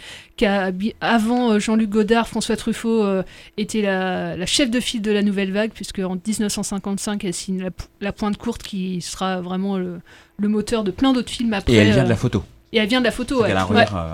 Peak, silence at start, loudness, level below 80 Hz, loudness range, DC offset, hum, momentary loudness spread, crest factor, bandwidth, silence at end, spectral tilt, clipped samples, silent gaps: 0 dBFS; 0 s; -20 LUFS; -42 dBFS; 6 LU; under 0.1%; none; 10 LU; 20 dB; 16 kHz; 0 s; -5 dB/octave; under 0.1%; none